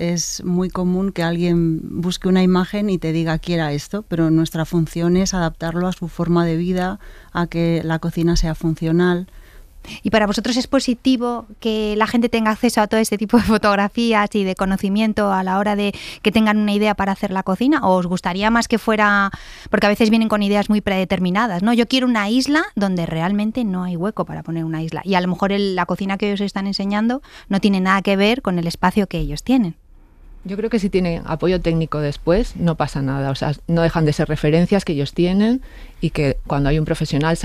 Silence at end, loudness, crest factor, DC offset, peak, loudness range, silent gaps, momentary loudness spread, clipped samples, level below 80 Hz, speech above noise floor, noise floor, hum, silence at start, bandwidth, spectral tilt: 0 s; -19 LUFS; 16 dB; under 0.1%; -2 dBFS; 4 LU; none; 7 LU; under 0.1%; -36 dBFS; 25 dB; -43 dBFS; none; 0 s; 15 kHz; -6 dB/octave